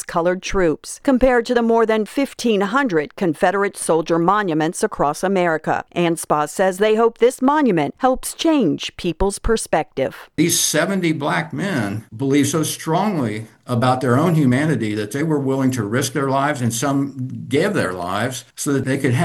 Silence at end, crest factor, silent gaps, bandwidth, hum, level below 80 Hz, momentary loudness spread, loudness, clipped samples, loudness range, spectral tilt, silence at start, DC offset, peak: 0 s; 18 dB; none; 17 kHz; none; -40 dBFS; 7 LU; -19 LUFS; under 0.1%; 2 LU; -5 dB/octave; 0 s; under 0.1%; -2 dBFS